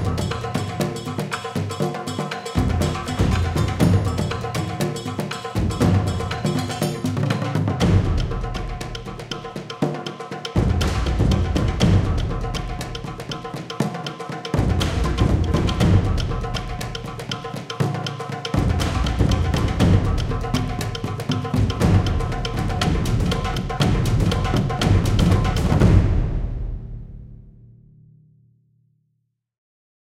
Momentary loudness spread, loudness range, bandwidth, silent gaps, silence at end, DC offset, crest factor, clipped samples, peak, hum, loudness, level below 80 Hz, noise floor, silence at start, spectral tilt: 12 LU; 4 LU; 15.5 kHz; none; 2.4 s; under 0.1%; 20 dB; under 0.1%; -2 dBFS; none; -22 LUFS; -28 dBFS; -72 dBFS; 0 s; -6.5 dB/octave